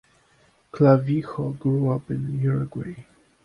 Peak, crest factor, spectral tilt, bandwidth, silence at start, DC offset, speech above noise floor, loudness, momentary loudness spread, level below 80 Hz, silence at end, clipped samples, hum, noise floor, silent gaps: -4 dBFS; 20 dB; -10.5 dB/octave; 5.4 kHz; 0.75 s; under 0.1%; 38 dB; -23 LUFS; 18 LU; -56 dBFS; 0.4 s; under 0.1%; none; -60 dBFS; none